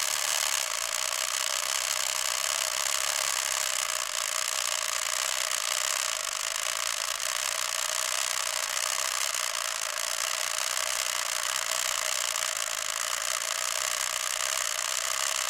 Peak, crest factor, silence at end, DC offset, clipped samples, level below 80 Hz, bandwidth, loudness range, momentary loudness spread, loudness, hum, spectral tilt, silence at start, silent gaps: -10 dBFS; 20 dB; 0 s; under 0.1%; under 0.1%; -66 dBFS; 17 kHz; 1 LU; 2 LU; -27 LUFS; none; 3.5 dB/octave; 0 s; none